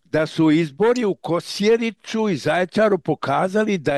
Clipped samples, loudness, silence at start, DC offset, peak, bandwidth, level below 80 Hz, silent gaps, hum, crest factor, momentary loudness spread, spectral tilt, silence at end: under 0.1%; -20 LUFS; 0.15 s; under 0.1%; -8 dBFS; 12.5 kHz; -60 dBFS; none; none; 12 dB; 5 LU; -6 dB/octave; 0 s